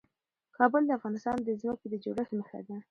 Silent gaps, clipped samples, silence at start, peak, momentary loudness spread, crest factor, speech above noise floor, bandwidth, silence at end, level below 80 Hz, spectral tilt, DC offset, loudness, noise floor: none; under 0.1%; 0.6 s; -10 dBFS; 12 LU; 22 dB; 47 dB; 9.4 kHz; 0.1 s; -70 dBFS; -7.5 dB/octave; under 0.1%; -31 LUFS; -78 dBFS